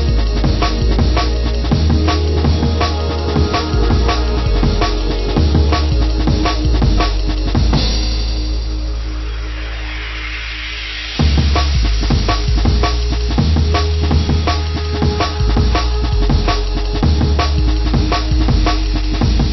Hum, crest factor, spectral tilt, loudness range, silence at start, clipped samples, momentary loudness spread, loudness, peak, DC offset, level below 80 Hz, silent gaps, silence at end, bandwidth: none; 12 dB; -6 dB/octave; 4 LU; 0 s; under 0.1%; 8 LU; -16 LUFS; -2 dBFS; under 0.1%; -16 dBFS; none; 0 s; 6 kHz